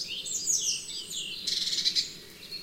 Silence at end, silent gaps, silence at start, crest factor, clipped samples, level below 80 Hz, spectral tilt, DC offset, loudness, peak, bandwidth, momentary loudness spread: 0 s; none; 0 s; 20 dB; under 0.1%; -64 dBFS; 1.5 dB/octave; under 0.1%; -28 LUFS; -12 dBFS; 16 kHz; 11 LU